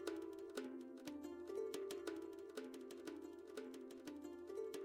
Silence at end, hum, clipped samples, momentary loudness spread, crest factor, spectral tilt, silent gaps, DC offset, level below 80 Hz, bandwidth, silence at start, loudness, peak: 0 s; none; under 0.1%; 6 LU; 20 dB; -3.5 dB/octave; none; under 0.1%; -84 dBFS; 16 kHz; 0 s; -51 LUFS; -30 dBFS